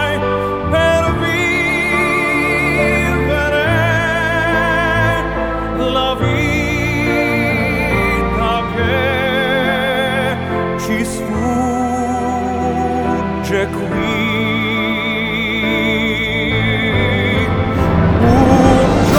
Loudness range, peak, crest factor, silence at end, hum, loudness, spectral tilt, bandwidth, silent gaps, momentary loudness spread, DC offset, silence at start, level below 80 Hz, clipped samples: 3 LU; 0 dBFS; 14 dB; 0 s; none; -15 LUFS; -6 dB/octave; 20 kHz; none; 5 LU; under 0.1%; 0 s; -28 dBFS; under 0.1%